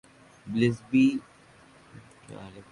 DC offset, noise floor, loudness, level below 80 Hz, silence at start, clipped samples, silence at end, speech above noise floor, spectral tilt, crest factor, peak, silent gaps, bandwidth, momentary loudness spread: under 0.1%; -55 dBFS; -26 LUFS; -64 dBFS; 0.45 s; under 0.1%; 0.1 s; 29 dB; -7 dB/octave; 20 dB; -10 dBFS; none; 11 kHz; 23 LU